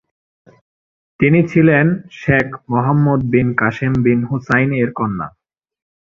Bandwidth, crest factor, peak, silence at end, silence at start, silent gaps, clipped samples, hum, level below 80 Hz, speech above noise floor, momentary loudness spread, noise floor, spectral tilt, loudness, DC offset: 7 kHz; 16 dB; 0 dBFS; 0.8 s; 1.2 s; none; under 0.1%; none; -46 dBFS; over 75 dB; 9 LU; under -90 dBFS; -9 dB/octave; -15 LUFS; under 0.1%